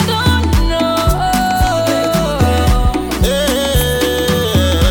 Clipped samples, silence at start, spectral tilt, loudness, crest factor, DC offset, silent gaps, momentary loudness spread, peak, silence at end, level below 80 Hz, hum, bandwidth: under 0.1%; 0 s; -5 dB/octave; -14 LUFS; 10 dB; under 0.1%; none; 2 LU; -4 dBFS; 0 s; -18 dBFS; none; 18 kHz